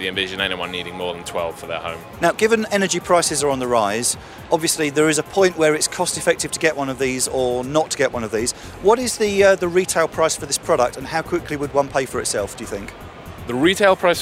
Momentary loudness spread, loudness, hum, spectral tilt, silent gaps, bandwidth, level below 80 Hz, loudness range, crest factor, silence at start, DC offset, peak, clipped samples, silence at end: 12 LU; -19 LUFS; none; -3 dB/octave; none; 16 kHz; -46 dBFS; 3 LU; 18 dB; 0 s; under 0.1%; -2 dBFS; under 0.1%; 0 s